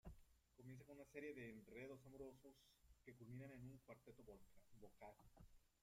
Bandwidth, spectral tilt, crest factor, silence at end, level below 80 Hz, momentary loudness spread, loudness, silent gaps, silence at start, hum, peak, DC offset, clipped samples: 16 kHz; -6.5 dB/octave; 22 dB; 0.15 s; -74 dBFS; 11 LU; -61 LUFS; none; 0.05 s; none; -40 dBFS; under 0.1%; under 0.1%